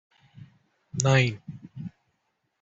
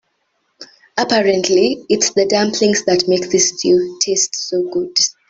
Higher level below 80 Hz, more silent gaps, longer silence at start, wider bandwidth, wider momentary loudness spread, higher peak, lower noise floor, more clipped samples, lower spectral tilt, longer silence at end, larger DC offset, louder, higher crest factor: about the same, -60 dBFS vs -58 dBFS; neither; second, 0.35 s vs 0.6 s; about the same, 8 kHz vs 8 kHz; first, 21 LU vs 5 LU; about the same, -4 dBFS vs -2 dBFS; first, -76 dBFS vs -66 dBFS; neither; first, -5 dB/octave vs -2.5 dB/octave; first, 0.75 s vs 0.2 s; neither; second, -24 LUFS vs -15 LUFS; first, 26 dB vs 14 dB